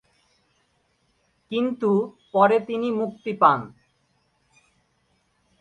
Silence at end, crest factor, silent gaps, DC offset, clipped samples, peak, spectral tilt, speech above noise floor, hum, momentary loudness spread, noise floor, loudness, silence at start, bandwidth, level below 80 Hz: 1.95 s; 24 dB; none; under 0.1%; under 0.1%; -2 dBFS; -7.5 dB/octave; 46 dB; none; 10 LU; -68 dBFS; -22 LUFS; 1.5 s; 9.2 kHz; -70 dBFS